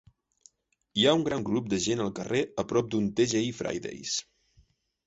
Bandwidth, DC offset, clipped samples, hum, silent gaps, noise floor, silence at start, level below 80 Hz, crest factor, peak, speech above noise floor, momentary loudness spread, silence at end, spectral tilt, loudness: 8 kHz; under 0.1%; under 0.1%; none; none; -65 dBFS; 0.95 s; -60 dBFS; 20 dB; -10 dBFS; 37 dB; 10 LU; 0.85 s; -4 dB/octave; -28 LUFS